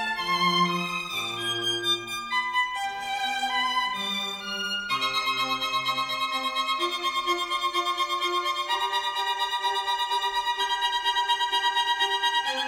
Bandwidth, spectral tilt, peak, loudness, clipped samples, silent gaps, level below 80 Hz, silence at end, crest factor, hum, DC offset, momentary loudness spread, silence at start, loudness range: 19 kHz; -1.5 dB/octave; -12 dBFS; -25 LUFS; under 0.1%; none; -62 dBFS; 0 s; 16 dB; none; under 0.1%; 5 LU; 0 s; 2 LU